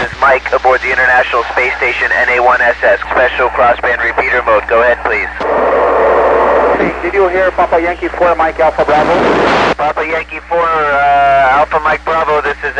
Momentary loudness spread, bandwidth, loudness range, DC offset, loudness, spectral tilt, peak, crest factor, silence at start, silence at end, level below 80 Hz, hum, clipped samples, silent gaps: 5 LU; 10 kHz; 1 LU; 0.2%; -11 LUFS; -5 dB/octave; 0 dBFS; 10 dB; 0 s; 0 s; -34 dBFS; none; under 0.1%; none